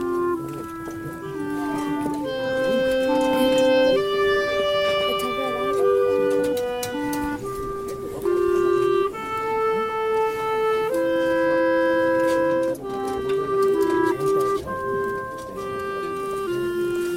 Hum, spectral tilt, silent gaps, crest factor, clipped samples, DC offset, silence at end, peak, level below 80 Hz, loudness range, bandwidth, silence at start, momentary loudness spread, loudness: none; -5 dB/octave; none; 14 dB; under 0.1%; under 0.1%; 0 s; -8 dBFS; -50 dBFS; 3 LU; 16.5 kHz; 0 s; 10 LU; -23 LUFS